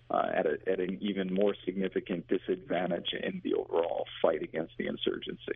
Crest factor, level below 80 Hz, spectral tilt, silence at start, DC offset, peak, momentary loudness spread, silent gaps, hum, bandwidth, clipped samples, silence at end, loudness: 20 dB; -64 dBFS; -4 dB/octave; 0.1 s; under 0.1%; -12 dBFS; 5 LU; none; none; 3.9 kHz; under 0.1%; 0 s; -32 LUFS